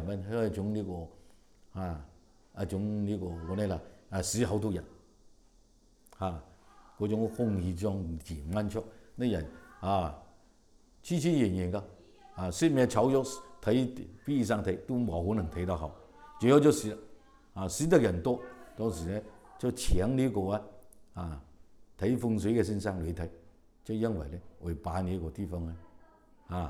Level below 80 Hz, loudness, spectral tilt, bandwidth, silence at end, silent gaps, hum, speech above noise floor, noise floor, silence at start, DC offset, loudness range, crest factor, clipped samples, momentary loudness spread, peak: -48 dBFS; -32 LUFS; -6.5 dB/octave; 17 kHz; 0 s; none; none; 32 dB; -63 dBFS; 0 s; under 0.1%; 7 LU; 24 dB; under 0.1%; 16 LU; -8 dBFS